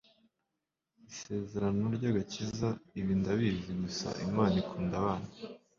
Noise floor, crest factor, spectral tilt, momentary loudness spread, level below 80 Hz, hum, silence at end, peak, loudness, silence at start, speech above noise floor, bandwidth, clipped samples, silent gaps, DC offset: -87 dBFS; 20 dB; -6.5 dB/octave; 9 LU; -56 dBFS; none; 0.2 s; -14 dBFS; -34 LUFS; 1.1 s; 54 dB; 7.4 kHz; under 0.1%; none; under 0.1%